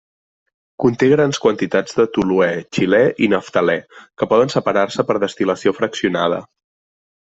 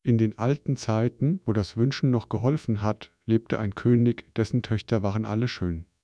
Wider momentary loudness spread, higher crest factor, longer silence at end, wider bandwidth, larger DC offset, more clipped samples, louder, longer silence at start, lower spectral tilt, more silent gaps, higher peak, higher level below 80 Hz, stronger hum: about the same, 5 LU vs 6 LU; about the same, 16 dB vs 16 dB; first, 0.85 s vs 0.2 s; second, 8 kHz vs 9.2 kHz; neither; neither; first, -17 LUFS vs -26 LUFS; first, 0.8 s vs 0.05 s; second, -5.5 dB/octave vs -8 dB/octave; neither; first, -2 dBFS vs -10 dBFS; about the same, -54 dBFS vs -52 dBFS; neither